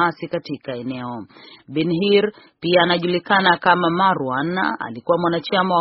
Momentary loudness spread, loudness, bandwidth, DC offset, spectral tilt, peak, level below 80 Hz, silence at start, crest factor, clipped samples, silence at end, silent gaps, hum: 12 LU; -19 LUFS; 5.8 kHz; under 0.1%; -3 dB/octave; 0 dBFS; -60 dBFS; 0 s; 20 dB; under 0.1%; 0 s; none; none